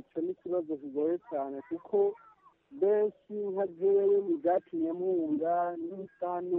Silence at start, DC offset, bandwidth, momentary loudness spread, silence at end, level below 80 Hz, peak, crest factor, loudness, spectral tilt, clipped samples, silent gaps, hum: 0.15 s; under 0.1%; 3.5 kHz; 10 LU; 0 s; -80 dBFS; -18 dBFS; 12 dB; -31 LUFS; -8 dB/octave; under 0.1%; none; none